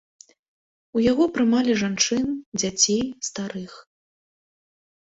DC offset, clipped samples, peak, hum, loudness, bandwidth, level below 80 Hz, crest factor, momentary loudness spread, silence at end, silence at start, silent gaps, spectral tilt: under 0.1%; under 0.1%; -4 dBFS; none; -22 LUFS; 8.2 kHz; -58 dBFS; 20 dB; 12 LU; 1.25 s; 0.95 s; 2.46-2.52 s; -3 dB/octave